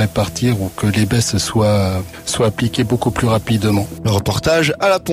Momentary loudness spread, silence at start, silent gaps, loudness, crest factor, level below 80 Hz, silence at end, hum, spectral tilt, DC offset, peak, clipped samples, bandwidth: 4 LU; 0 s; none; -16 LUFS; 12 dB; -38 dBFS; 0 s; none; -5 dB/octave; under 0.1%; -4 dBFS; under 0.1%; 16 kHz